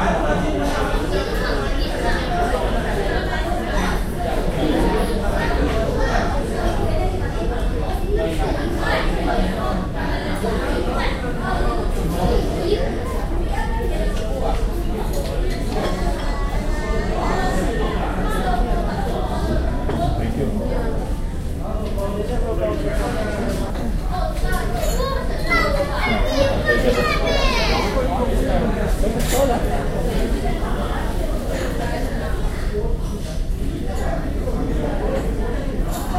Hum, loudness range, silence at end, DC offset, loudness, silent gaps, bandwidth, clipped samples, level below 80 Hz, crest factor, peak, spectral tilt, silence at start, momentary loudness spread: none; 5 LU; 0 s; under 0.1%; -22 LUFS; none; 15.5 kHz; under 0.1%; -22 dBFS; 14 dB; -4 dBFS; -6 dB/octave; 0 s; 6 LU